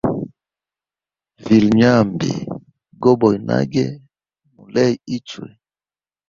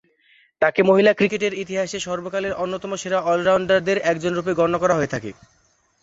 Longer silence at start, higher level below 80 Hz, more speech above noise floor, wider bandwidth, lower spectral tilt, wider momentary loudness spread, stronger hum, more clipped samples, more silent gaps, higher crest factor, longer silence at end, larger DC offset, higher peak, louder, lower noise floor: second, 0.05 s vs 0.6 s; about the same, -52 dBFS vs -56 dBFS; first, over 74 dB vs 38 dB; second, 7.2 kHz vs 8 kHz; first, -7 dB/octave vs -5 dB/octave; first, 21 LU vs 10 LU; neither; neither; neither; about the same, 18 dB vs 18 dB; about the same, 0.8 s vs 0.7 s; neither; about the same, -2 dBFS vs -4 dBFS; first, -17 LUFS vs -20 LUFS; first, under -90 dBFS vs -58 dBFS